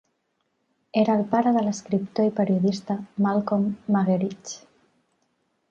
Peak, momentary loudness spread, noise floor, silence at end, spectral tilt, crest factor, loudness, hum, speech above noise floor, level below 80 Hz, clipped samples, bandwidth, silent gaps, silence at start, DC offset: -8 dBFS; 9 LU; -74 dBFS; 1.15 s; -7 dB/octave; 18 dB; -24 LUFS; none; 51 dB; -66 dBFS; under 0.1%; 7.6 kHz; none; 0.95 s; under 0.1%